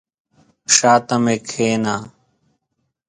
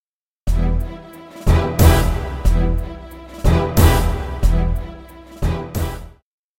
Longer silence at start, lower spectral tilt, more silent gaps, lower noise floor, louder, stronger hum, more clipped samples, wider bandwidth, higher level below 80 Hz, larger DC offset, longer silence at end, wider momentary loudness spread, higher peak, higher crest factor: first, 0.7 s vs 0.45 s; second, -3 dB/octave vs -6 dB/octave; neither; first, -73 dBFS vs -38 dBFS; first, -16 LUFS vs -19 LUFS; neither; neither; second, 10.5 kHz vs 16.5 kHz; second, -60 dBFS vs -20 dBFS; neither; first, 1 s vs 0.5 s; second, 13 LU vs 22 LU; about the same, 0 dBFS vs 0 dBFS; about the same, 20 dB vs 18 dB